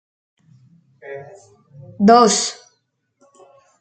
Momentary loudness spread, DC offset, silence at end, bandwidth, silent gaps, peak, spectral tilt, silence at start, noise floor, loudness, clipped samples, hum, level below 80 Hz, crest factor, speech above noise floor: 25 LU; under 0.1%; 1.3 s; 9.2 kHz; none; -2 dBFS; -4 dB/octave; 1.05 s; -68 dBFS; -14 LUFS; under 0.1%; none; -66 dBFS; 20 dB; 52 dB